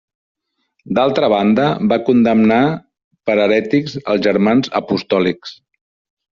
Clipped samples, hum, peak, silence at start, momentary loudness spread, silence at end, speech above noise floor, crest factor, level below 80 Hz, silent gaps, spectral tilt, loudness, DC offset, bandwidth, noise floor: under 0.1%; none; -2 dBFS; 0.85 s; 8 LU; 0.85 s; 53 dB; 14 dB; -56 dBFS; 3.04-3.11 s; -5 dB/octave; -15 LUFS; under 0.1%; 7.2 kHz; -67 dBFS